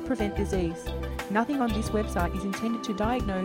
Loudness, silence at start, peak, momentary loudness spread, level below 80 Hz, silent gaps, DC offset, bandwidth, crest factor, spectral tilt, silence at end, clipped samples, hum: -29 LUFS; 0 s; -12 dBFS; 5 LU; -38 dBFS; none; under 0.1%; 16.5 kHz; 16 dB; -6 dB/octave; 0 s; under 0.1%; none